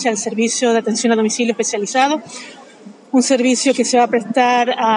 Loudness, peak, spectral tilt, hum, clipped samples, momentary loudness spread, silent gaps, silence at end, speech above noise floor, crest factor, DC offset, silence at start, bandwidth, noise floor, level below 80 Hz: -16 LUFS; -2 dBFS; -3 dB/octave; none; under 0.1%; 5 LU; none; 0 s; 25 dB; 16 dB; under 0.1%; 0 s; 11 kHz; -40 dBFS; -76 dBFS